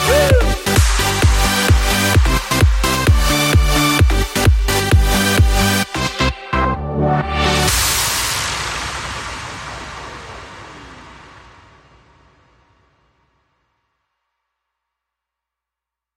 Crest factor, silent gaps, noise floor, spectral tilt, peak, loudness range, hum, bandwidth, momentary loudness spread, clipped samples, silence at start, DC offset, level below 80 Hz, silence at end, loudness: 16 dB; none; -86 dBFS; -4 dB/octave; -2 dBFS; 16 LU; none; 16.5 kHz; 16 LU; under 0.1%; 0 s; under 0.1%; -22 dBFS; 5.05 s; -15 LUFS